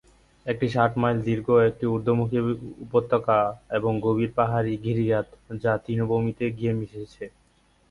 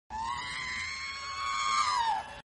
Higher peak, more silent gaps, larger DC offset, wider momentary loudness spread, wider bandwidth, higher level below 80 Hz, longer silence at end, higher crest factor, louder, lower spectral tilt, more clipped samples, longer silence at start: first, -6 dBFS vs -18 dBFS; neither; neither; first, 12 LU vs 9 LU; about the same, 10.5 kHz vs 11.5 kHz; about the same, -54 dBFS vs -58 dBFS; first, 0.6 s vs 0.05 s; about the same, 20 dB vs 16 dB; first, -25 LUFS vs -32 LUFS; first, -9 dB/octave vs 0 dB/octave; neither; first, 0.45 s vs 0.1 s